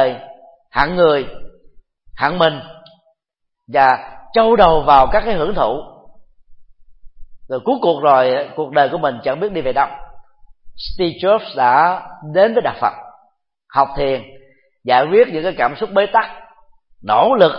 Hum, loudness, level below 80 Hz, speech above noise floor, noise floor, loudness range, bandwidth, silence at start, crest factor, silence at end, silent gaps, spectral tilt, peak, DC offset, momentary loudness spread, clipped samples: none; -16 LUFS; -38 dBFS; 61 dB; -75 dBFS; 4 LU; 5.8 kHz; 0 s; 16 dB; 0 s; none; -8 dB/octave; 0 dBFS; under 0.1%; 14 LU; under 0.1%